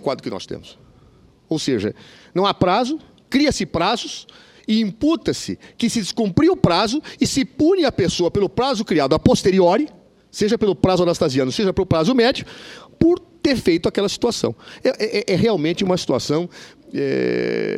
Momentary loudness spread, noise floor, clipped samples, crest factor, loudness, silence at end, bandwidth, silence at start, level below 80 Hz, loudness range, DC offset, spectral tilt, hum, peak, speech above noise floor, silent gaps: 12 LU; -51 dBFS; under 0.1%; 18 dB; -19 LUFS; 0 s; 14 kHz; 0 s; -44 dBFS; 3 LU; under 0.1%; -5.5 dB/octave; none; 0 dBFS; 32 dB; none